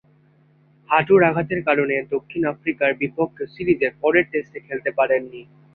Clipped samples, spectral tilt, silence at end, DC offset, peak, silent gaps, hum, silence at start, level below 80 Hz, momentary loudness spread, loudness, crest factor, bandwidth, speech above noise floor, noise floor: under 0.1%; -9.5 dB/octave; 0.3 s; under 0.1%; -2 dBFS; none; none; 0.9 s; -58 dBFS; 11 LU; -21 LUFS; 20 dB; 4.6 kHz; 36 dB; -56 dBFS